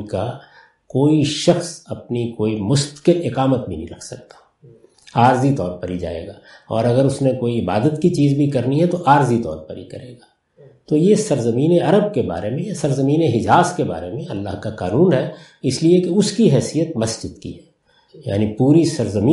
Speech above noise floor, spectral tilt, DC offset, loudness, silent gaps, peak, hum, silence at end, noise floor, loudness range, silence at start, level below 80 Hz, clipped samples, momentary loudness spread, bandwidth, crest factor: 32 dB; -6.5 dB/octave; under 0.1%; -18 LUFS; none; 0 dBFS; none; 0 s; -49 dBFS; 3 LU; 0 s; -50 dBFS; under 0.1%; 15 LU; 11.5 kHz; 18 dB